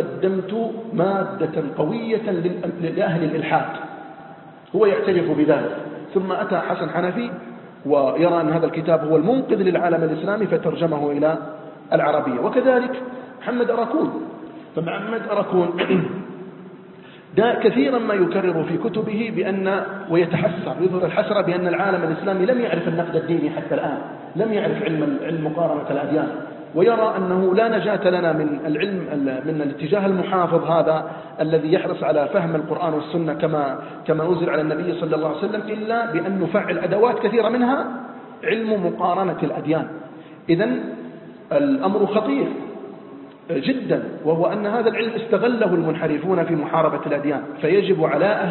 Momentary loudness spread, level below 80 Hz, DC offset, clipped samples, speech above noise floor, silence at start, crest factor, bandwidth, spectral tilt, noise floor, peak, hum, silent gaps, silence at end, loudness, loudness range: 11 LU; -64 dBFS; under 0.1%; under 0.1%; 22 dB; 0 s; 18 dB; 4.3 kHz; -11.5 dB/octave; -42 dBFS; -4 dBFS; none; none; 0 s; -21 LUFS; 3 LU